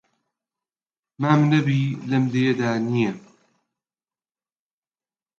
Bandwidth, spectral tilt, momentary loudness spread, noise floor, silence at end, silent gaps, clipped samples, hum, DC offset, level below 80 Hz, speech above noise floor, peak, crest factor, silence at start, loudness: 7.2 kHz; -7.5 dB/octave; 8 LU; under -90 dBFS; 2.2 s; none; under 0.1%; none; under 0.1%; -66 dBFS; over 70 dB; -4 dBFS; 22 dB; 1.2 s; -21 LUFS